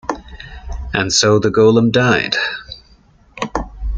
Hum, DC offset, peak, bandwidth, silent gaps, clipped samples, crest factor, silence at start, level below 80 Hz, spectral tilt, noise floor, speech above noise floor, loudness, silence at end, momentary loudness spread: none; under 0.1%; -2 dBFS; 9.4 kHz; none; under 0.1%; 16 dB; 0.05 s; -32 dBFS; -4 dB/octave; -49 dBFS; 36 dB; -14 LUFS; 0 s; 22 LU